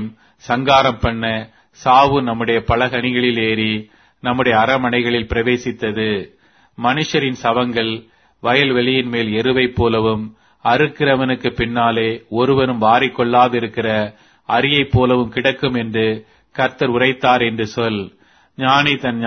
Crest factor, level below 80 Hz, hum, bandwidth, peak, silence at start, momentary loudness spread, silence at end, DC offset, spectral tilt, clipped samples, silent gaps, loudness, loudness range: 16 dB; -40 dBFS; none; 6.6 kHz; 0 dBFS; 0 s; 8 LU; 0 s; under 0.1%; -6 dB/octave; under 0.1%; none; -16 LUFS; 3 LU